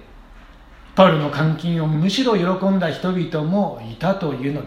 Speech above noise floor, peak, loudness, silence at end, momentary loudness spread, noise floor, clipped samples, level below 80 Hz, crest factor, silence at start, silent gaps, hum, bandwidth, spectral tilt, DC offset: 25 dB; 0 dBFS; -19 LUFS; 0 s; 8 LU; -43 dBFS; under 0.1%; -48 dBFS; 20 dB; 0 s; none; none; 11 kHz; -7 dB/octave; under 0.1%